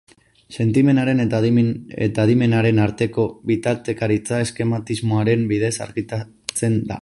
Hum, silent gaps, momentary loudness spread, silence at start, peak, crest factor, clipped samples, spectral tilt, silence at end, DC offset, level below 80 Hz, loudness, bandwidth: none; none; 9 LU; 0.5 s; -4 dBFS; 16 dB; under 0.1%; -6.5 dB/octave; 0 s; under 0.1%; -50 dBFS; -20 LUFS; 11.5 kHz